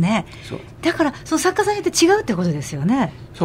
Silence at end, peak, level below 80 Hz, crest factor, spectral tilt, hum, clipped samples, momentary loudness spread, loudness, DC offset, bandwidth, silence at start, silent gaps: 0 s; -4 dBFS; -46 dBFS; 16 dB; -4.5 dB/octave; none; under 0.1%; 10 LU; -19 LUFS; under 0.1%; 16 kHz; 0 s; none